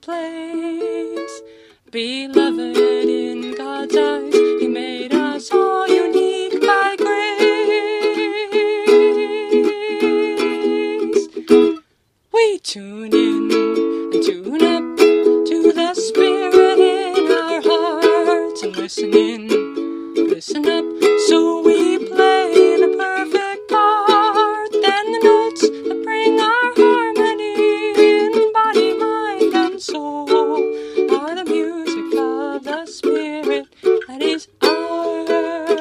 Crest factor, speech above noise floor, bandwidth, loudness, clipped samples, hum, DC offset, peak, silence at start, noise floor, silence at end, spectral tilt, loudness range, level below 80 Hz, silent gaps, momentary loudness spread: 16 dB; 45 dB; 14.5 kHz; -16 LUFS; under 0.1%; none; under 0.1%; 0 dBFS; 0.1 s; -62 dBFS; 0 s; -3 dB/octave; 5 LU; -64 dBFS; none; 11 LU